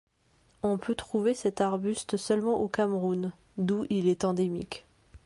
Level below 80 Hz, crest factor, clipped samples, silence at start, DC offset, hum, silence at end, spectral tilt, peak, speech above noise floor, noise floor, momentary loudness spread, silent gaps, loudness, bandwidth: -60 dBFS; 16 dB; under 0.1%; 0.65 s; under 0.1%; none; 0.1 s; -6 dB/octave; -14 dBFS; 38 dB; -66 dBFS; 7 LU; none; -29 LUFS; 11.5 kHz